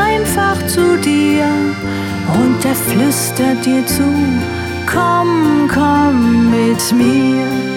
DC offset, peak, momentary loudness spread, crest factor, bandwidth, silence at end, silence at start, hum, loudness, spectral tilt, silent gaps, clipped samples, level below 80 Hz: under 0.1%; 0 dBFS; 5 LU; 12 dB; 18 kHz; 0 s; 0 s; none; -13 LUFS; -5 dB/octave; none; under 0.1%; -38 dBFS